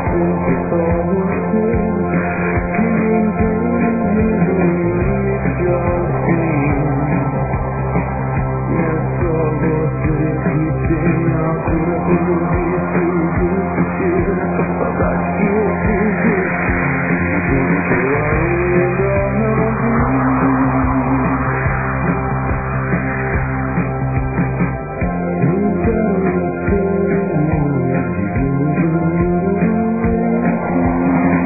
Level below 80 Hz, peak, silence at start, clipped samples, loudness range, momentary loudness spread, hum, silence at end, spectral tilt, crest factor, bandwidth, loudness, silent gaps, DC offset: -28 dBFS; -2 dBFS; 0 s; under 0.1%; 2 LU; 4 LU; none; 0 s; -15.5 dB/octave; 14 dB; 2.7 kHz; -16 LUFS; none; 0.6%